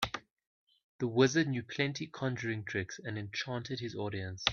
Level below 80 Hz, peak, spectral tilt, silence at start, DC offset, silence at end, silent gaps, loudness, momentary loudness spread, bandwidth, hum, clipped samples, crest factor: -66 dBFS; -10 dBFS; -5 dB/octave; 0 s; under 0.1%; 0 s; 0.31-0.37 s, 0.47-0.67 s, 0.84-0.99 s; -35 LUFS; 11 LU; 9.4 kHz; none; under 0.1%; 26 dB